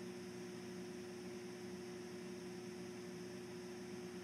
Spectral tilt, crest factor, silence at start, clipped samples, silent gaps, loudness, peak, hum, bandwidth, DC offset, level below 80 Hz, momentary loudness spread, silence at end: -5 dB/octave; 12 dB; 0 s; under 0.1%; none; -50 LUFS; -38 dBFS; none; 15.5 kHz; under 0.1%; -82 dBFS; 0 LU; 0 s